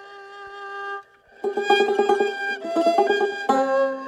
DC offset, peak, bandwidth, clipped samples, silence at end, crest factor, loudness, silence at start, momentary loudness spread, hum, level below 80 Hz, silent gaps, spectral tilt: under 0.1%; -4 dBFS; 12.5 kHz; under 0.1%; 0 s; 18 dB; -22 LUFS; 0 s; 17 LU; none; -72 dBFS; none; -3 dB/octave